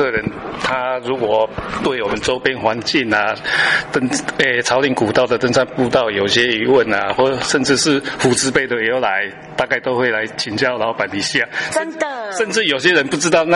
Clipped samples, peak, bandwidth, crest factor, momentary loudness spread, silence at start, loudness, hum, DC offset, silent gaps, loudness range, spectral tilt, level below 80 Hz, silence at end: under 0.1%; -2 dBFS; 11.5 kHz; 16 dB; 6 LU; 0 s; -16 LUFS; none; under 0.1%; none; 3 LU; -3.5 dB/octave; -48 dBFS; 0 s